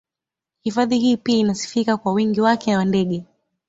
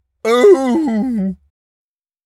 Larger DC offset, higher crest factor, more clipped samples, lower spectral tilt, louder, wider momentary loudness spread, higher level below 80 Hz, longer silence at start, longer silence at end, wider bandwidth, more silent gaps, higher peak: neither; about the same, 16 dB vs 16 dB; neither; about the same, -5.5 dB/octave vs -6 dB/octave; second, -20 LUFS vs -14 LUFS; second, 7 LU vs 11 LU; second, -58 dBFS vs -52 dBFS; first, 0.65 s vs 0.25 s; second, 0.45 s vs 0.9 s; second, 8 kHz vs 13 kHz; neither; second, -4 dBFS vs 0 dBFS